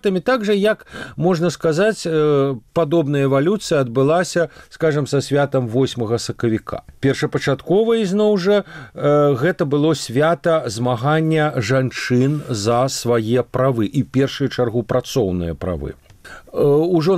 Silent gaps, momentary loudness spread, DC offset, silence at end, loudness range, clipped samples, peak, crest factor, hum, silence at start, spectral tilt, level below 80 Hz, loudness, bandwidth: none; 6 LU; under 0.1%; 0 s; 3 LU; under 0.1%; -6 dBFS; 12 dB; none; 0.05 s; -6 dB/octave; -46 dBFS; -18 LUFS; 15 kHz